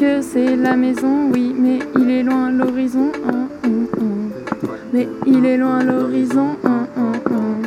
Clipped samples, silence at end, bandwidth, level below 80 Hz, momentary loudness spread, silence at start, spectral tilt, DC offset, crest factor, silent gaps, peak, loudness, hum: under 0.1%; 0 s; 11.5 kHz; -56 dBFS; 6 LU; 0 s; -7 dB/octave; under 0.1%; 16 dB; none; 0 dBFS; -17 LUFS; none